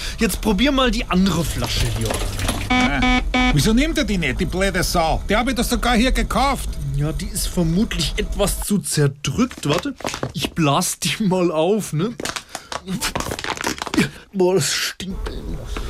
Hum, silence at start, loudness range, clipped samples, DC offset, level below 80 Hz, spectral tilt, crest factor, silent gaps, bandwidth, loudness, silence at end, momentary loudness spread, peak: none; 0 s; 3 LU; under 0.1%; under 0.1%; -28 dBFS; -4.5 dB/octave; 14 dB; none; 16 kHz; -20 LUFS; 0 s; 9 LU; -6 dBFS